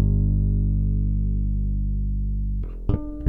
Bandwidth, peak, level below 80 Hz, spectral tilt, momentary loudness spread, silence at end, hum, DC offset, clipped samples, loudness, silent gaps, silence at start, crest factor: 1.4 kHz; -6 dBFS; -24 dBFS; -12.5 dB/octave; 6 LU; 0 s; 50 Hz at -25 dBFS; under 0.1%; under 0.1%; -25 LUFS; none; 0 s; 16 dB